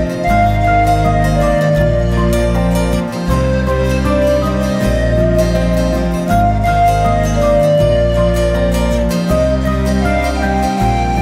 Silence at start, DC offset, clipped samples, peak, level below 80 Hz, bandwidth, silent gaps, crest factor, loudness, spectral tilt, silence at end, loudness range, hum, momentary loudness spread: 0 s; under 0.1%; under 0.1%; -2 dBFS; -20 dBFS; 16 kHz; none; 10 dB; -14 LUFS; -7 dB/octave; 0 s; 1 LU; none; 3 LU